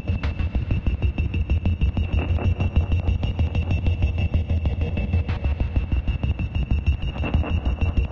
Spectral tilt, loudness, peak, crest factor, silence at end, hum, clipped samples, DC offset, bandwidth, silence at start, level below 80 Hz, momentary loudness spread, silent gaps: -8.5 dB/octave; -24 LUFS; -8 dBFS; 14 dB; 0 s; none; under 0.1%; under 0.1%; 6 kHz; 0 s; -26 dBFS; 3 LU; none